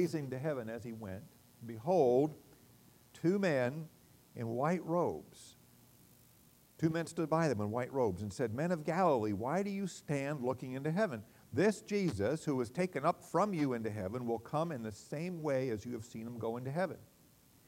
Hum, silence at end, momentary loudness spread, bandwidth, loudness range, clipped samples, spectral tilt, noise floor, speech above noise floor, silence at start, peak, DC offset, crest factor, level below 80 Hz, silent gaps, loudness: none; 0.6 s; 13 LU; 16 kHz; 4 LU; under 0.1%; -7 dB/octave; -65 dBFS; 30 dB; 0 s; -18 dBFS; under 0.1%; 18 dB; -72 dBFS; none; -36 LUFS